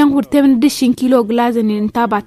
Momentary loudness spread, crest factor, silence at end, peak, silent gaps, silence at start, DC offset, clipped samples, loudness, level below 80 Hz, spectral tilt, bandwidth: 4 LU; 12 dB; 0.05 s; 0 dBFS; none; 0 s; under 0.1%; under 0.1%; -13 LUFS; -48 dBFS; -5.5 dB/octave; 14.5 kHz